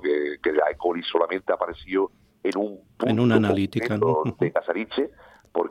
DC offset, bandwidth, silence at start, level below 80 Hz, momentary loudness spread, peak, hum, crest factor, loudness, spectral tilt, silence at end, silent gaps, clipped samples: under 0.1%; 12 kHz; 0 s; -58 dBFS; 9 LU; -4 dBFS; none; 20 dB; -25 LUFS; -7.5 dB/octave; 0 s; none; under 0.1%